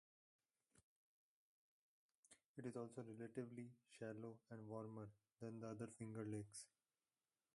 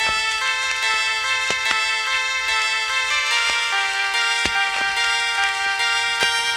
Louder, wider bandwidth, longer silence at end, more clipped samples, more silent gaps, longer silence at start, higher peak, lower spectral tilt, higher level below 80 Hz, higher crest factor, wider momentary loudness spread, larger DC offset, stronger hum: second, -55 LUFS vs -18 LUFS; second, 11.5 kHz vs 16.5 kHz; first, 0.9 s vs 0 s; neither; first, 0.83-2.09 s, 2.15-2.23 s, 2.46-2.55 s vs none; first, 0.75 s vs 0 s; second, -38 dBFS vs -2 dBFS; first, -6.5 dB/octave vs 1.5 dB/octave; second, -88 dBFS vs -52 dBFS; about the same, 20 dB vs 18 dB; first, 8 LU vs 2 LU; neither; neither